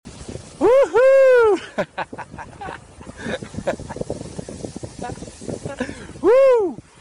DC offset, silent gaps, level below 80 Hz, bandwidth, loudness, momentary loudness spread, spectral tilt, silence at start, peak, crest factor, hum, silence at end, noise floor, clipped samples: under 0.1%; none; -46 dBFS; 11 kHz; -18 LUFS; 21 LU; -5.5 dB/octave; 0.05 s; -10 dBFS; 10 dB; none; 0.25 s; -38 dBFS; under 0.1%